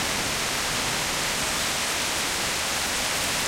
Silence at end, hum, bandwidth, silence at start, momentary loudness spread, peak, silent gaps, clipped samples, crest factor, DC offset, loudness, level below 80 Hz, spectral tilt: 0 s; none; 16 kHz; 0 s; 1 LU; -12 dBFS; none; under 0.1%; 16 dB; under 0.1%; -24 LUFS; -46 dBFS; -1 dB/octave